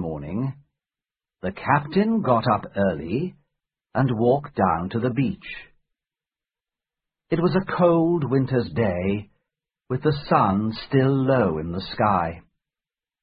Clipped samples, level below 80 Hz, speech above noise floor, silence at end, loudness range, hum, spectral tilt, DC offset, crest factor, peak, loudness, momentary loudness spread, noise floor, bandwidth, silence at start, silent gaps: under 0.1%; -48 dBFS; over 68 dB; 0.85 s; 3 LU; none; -12 dB/octave; under 0.1%; 20 dB; -4 dBFS; -23 LUFS; 11 LU; under -90 dBFS; 5.2 kHz; 0 s; none